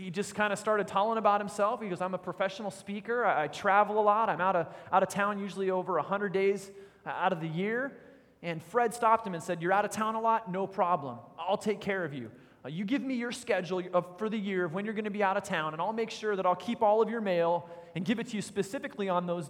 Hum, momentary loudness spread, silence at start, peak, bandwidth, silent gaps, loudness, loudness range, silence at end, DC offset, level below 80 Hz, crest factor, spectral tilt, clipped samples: none; 11 LU; 0 s; -12 dBFS; 17 kHz; none; -31 LUFS; 4 LU; 0 s; under 0.1%; -74 dBFS; 20 dB; -5.5 dB/octave; under 0.1%